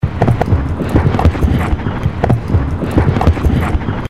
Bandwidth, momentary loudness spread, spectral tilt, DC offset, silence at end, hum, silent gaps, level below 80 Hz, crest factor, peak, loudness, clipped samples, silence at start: 13 kHz; 4 LU; -8.5 dB/octave; 2%; 0 s; none; none; -20 dBFS; 12 dB; -2 dBFS; -14 LUFS; under 0.1%; 0 s